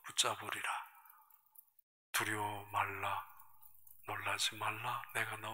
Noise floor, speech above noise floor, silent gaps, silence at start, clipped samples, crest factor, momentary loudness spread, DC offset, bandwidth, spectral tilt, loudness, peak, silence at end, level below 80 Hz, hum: -65 dBFS; 25 dB; 1.83-2.13 s; 0 s; under 0.1%; 24 dB; 20 LU; under 0.1%; 16 kHz; -1.5 dB/octave; -39 LUFS; -18 dBFS; 0 s; -80 dBFS; none